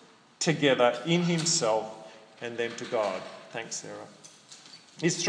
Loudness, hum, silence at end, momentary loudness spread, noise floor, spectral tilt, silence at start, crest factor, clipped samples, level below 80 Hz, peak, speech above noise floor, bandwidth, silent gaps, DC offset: -28 LUFS; none; 0 s; 23 LU; -51 dBFS; -3.5 dB/octave; 0.4 s; 20 dB; under 0.1%; -84 dBFS; -10 dBFS; 23 dB; 10.5 kHz; none; under 0.1%